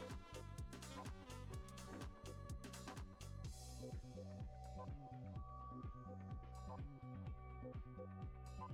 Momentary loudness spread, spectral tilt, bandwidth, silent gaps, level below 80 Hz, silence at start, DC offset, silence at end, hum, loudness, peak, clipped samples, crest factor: 1 LU; -5.5 dB/octave; 17 kHz; none; -58 dBFS; 0 s; under 0.1%; 0 s; none; -54 LUFS; -40 dBFS; under 0.1%; 12 dB